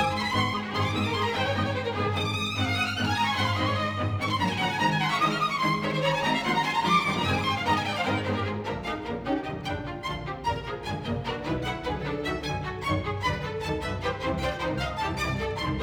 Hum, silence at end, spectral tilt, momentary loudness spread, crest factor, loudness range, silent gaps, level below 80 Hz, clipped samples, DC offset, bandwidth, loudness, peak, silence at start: none; 0 s; -5 dB/octave; 7 LU; 16 dB; 6 LU; none; -46 dBFS; under 0.1%; under 0.1%; 19.5 kHz; -27 LUFS; -10 dBFS; 0 s